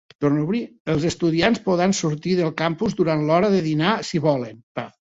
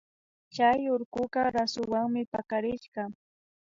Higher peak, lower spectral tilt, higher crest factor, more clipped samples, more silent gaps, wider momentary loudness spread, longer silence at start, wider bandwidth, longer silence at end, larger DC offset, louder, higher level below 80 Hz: first, -4 dBFS vs -12 dBFS; about the same, -6 dB/octave vs -5 dB/octave; about the same, 18 dB vs 18 dB; neither; about the same, 0.80-0.85 s, 4.63-4.75 s vs 1.05-1.12 s, 2.27-2.32 s, 2.88-2.92 s; second, 7 LU vs 13 LU; second, 0.2 s vs 0.55 s; about the same, 8 kHz vs 7.6 kHz; second, 0.2 s vs 0.5 s; neither; first, -21 LUFS vs -29 LUFS; first, -54 dBFS vs -64 dBFS